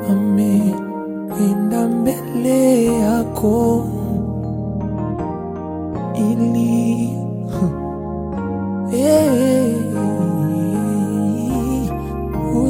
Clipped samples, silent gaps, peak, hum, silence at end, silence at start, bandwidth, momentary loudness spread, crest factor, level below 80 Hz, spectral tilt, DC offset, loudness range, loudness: under 0.1%; none; -2 dBFS; none; 0 s; 0 s; 17 kHz; 10 LU; 16 dB; -36 dBFS; -7.5 dB/octave; under 0.1%; 3 LU; -18 LUFS